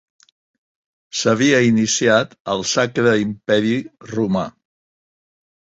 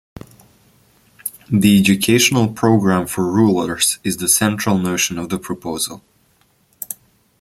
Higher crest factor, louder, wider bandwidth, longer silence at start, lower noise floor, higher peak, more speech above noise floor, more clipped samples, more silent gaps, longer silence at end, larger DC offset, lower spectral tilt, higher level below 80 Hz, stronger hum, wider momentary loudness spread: about the same, 18 dB vs 18 dB; about the same, -18 LUFS vs -16 LUFS; second, 8 kHz vs 16.5 kHz; about the same, 1.15 s vs 1.25 s; first, under -90 dBFS vs -58 dBFS; about the same, -2 dBFS vs 0 dBFS; first, over 73 dB vs 42 dB; neither; first, 2.40-2.45 s vs none; first, 1.3 s vs 0.45 s; neither; about the same, -4 dB/octave vs -4 dB/octave; about the same, -56 dBFS vs -52 dBFS; neither; second, 9 LU vs 16 LU